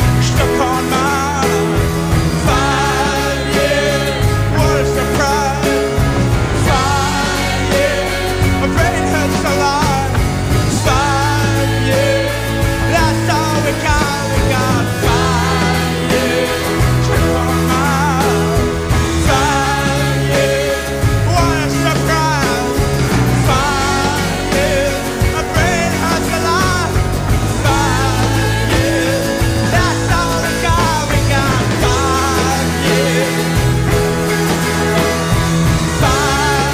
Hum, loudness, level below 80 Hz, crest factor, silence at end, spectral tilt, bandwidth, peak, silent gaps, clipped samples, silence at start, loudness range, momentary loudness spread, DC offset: none; -14 LUFS; -24 dBFS; 12 dB; 0 s; -5 dB/octave; 19.5 kHz; -2 dBFS; none; under 0.1%; 0 s; 1 LU; 2 LU; under 0.1%